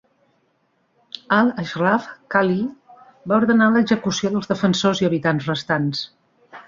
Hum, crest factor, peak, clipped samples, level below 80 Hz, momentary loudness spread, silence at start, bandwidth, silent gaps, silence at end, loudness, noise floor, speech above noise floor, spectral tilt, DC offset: none; 18 dB; -2 dBFS; under 0.1%; -58 dBFS; 13 LU; 1.3 s; 7.6 kHz; none; 0.05 s; -20 LUFS; -66 dBFS; 47 dB; -5.5 dB/octave; under 0.1%